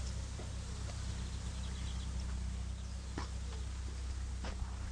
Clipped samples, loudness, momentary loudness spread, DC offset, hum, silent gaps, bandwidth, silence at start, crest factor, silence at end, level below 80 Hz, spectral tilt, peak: under 0.1%; -43 LUFS; 2 LU; under 0.1%; none; none; 10.5 kHz; 0 s; 16 dB; 0 s; -42 dBFS; -5 dB/octave; -24 dBFS